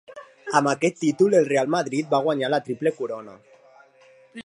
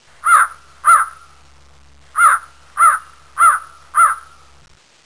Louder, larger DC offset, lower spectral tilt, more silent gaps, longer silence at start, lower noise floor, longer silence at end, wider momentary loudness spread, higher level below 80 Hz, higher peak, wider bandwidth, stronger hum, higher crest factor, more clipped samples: second, -22 LUFS vs -14 LUFS; second, under 0.1% vs 0.4%; first, -5 dB/octave vs 1.5 dB/octave; neither; second, 0.1 s vs 0.25 s; first, -54 dBFS vs -48 dBFS; second, 0.05 s vs 0.85 s; about the same, 13 LU vs 13 LU; second, -74 dBFS vs -54 dBFS; about the same, -4 dBFS vs -2 dBFS; about the same, 11.5 kHz vs 11 kHz; neither; first, 20 dB vs 14 dB; neither